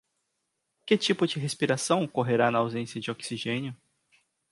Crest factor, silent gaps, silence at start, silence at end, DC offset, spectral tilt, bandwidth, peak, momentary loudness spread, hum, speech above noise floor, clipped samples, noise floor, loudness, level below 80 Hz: 20 dB; none; 0.85 s; 0.75 s; under 0.1%; -4.5 dB/octave; 11.5 kHz; -10 dBFS; 10 LU; none; 53 dB; under 0.1%; -80 dBFS; -27 LUFS; -72 dBFS